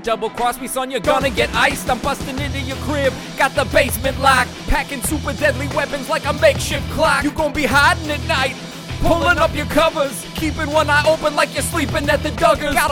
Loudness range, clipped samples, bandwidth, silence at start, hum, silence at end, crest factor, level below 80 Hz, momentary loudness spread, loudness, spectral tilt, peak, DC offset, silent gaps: 2 LU; under 0.1%; 18.5 kHz; 0 s; none; 0 s; 16 dB; -32 dBFS; 8 LU; -17 LUFS; -4 dB/octave; 0 dBFS; under 0.1%; none